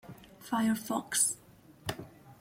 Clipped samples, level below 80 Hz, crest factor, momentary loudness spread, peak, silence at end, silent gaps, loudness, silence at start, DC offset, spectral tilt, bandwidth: under 0.1%; -66 dBFS; 20 dB; 22 LU; -14 dBFS; 0.05 s; none; -32 LUFS; 0.05 s; under 0.1%; -2.5 dB/octave; 16.5 kHz